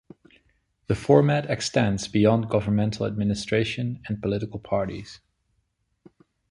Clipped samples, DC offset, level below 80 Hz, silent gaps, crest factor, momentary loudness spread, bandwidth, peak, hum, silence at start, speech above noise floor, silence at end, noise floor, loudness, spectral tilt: under 0.1%; under 0.1%; -50 dBFS; none; 22 dB; 11 LU; 11.5 kHz; -4 dBFS; none; 0.9 s; 49 dB; 1.35 s; -73 dBFS; -24 LUFS; -6.5 dB/octave